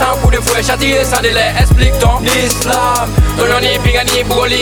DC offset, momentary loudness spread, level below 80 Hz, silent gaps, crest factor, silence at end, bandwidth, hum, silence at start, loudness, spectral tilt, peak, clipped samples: under 0.1%; 2 LU; -16 dBFS; none; 10 dB; 0 s; over 20 kHz; none; 0 s; -11 LUFS; -4 dB/octave; 0 dBFS; under 0.1%